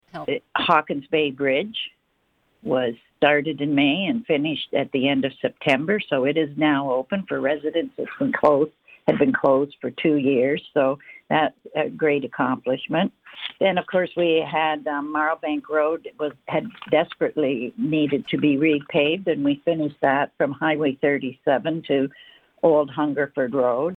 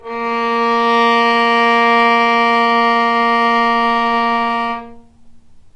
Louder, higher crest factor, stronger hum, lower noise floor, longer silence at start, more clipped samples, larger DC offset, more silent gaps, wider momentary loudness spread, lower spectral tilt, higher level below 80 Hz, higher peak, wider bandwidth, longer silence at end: second, -22 LUFS vs -13 LUFS; first, 18 dB vs 12 dB; neither; first, -68 dBFS vs -40 dBFS; about the same, 0.15 s vs 0.05 s; neither; neither; neither; about the same, 7 LU vs 7 LU; first, -7.5 dB/octave vs -4 dB/octave; second, -64 dBFS vs -50 dBFS; about the same, -4 dBFS vs -2 dBFS; second, 5.4 kHz vs 9.6 kHz; second, 0 s vs 0.15 s